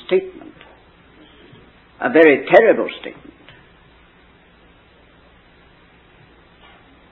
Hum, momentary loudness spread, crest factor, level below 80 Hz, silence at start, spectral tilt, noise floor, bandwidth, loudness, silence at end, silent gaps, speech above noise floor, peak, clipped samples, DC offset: none; 24 LU; 20 dB; -56 dBFS; 0.1 s; -7.5 dB/octave; -50 dBFS; 4.5 kHz; -14 LUFS; 4 s; none; 36 dB; 0 dBFS; under 0.1%; under 0.1%